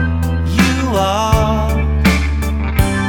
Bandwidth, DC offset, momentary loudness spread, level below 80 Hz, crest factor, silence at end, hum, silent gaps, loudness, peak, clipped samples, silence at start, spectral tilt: 18 kHz; under 0.1%; 4 LU; -20 dBFS; 14 dB; 0 s; none; none; -15 LUFS; 0 dBFS; under 0.1%; 0 s; -6 dB/octave